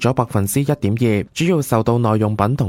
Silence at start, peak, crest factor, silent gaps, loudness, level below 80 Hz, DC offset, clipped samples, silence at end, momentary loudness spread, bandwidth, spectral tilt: 0 s; -2 dBFS; 16 dB; none; -18 LUFS; -46 dBFS; under 0.1%; under 0.1%; 0 s; 2 LU; 16.5 kHz; -6.5 dB/octave